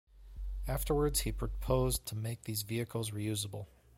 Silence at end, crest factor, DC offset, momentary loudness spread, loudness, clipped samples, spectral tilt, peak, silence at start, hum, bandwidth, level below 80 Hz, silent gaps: 0.3 s; 20 dB; under 0.1%; 13 LU; -36 LUFS; under 0.1%; -5 dB/octave; -16 dBFS; 0.15 s; none; 16.5 kHz; -42 dBFS; none